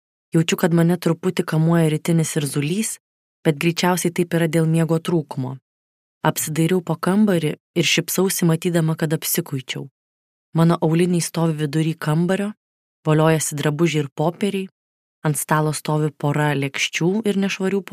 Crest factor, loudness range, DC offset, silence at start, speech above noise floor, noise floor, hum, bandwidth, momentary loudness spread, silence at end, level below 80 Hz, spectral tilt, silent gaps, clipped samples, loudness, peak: 18 dB; 2 LU; under 0.1%; 0.35 s; over 71 dB; under -90 dBFS; none; 15.5 kHz; 8 LU; 0.1 s; -64 dBFS; -5.5 dB/octave; 3.00-3.43 s, 5.62-6.21 s, 7.60-7.74 s, 9.91-10.53 s, 12.57-13.03 s, 14.12-14.16 s, 14.71-15.22 s; under 0.1%; -20 LUFS; -2 dBFS